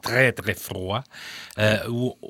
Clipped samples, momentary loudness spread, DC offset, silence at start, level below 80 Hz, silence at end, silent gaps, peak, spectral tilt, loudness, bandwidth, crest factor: under 0.1%; 15 LU; under 0.1%; 0.05 s; -56 dBFS; 0 s; none; -4 dBFS; -5 dB/octave; -24 LUFS; 18 kHz; 22 dB